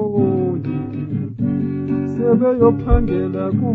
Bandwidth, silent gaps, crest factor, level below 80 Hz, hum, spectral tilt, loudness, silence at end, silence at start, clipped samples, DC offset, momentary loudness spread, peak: 4.4 kHz; none; 16 dB; -28 dBFS; none; -12 dB/octave; -18 LUFS; 0 s; 0 s; under 0.1%; under 0.1%; 10 LU; -2 dBFS